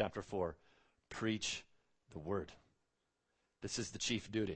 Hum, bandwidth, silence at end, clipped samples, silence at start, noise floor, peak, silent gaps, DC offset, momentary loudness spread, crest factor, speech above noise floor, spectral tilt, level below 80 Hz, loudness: none; 8.4 kHz; 0 s; under 0.1%; 0 s; -85 dBFS; -20 dBFS; none; under 0.1%; 14 LU; 22 dB; 43 dB; -4 dB/octave; -66 dBFS; -41 LUFS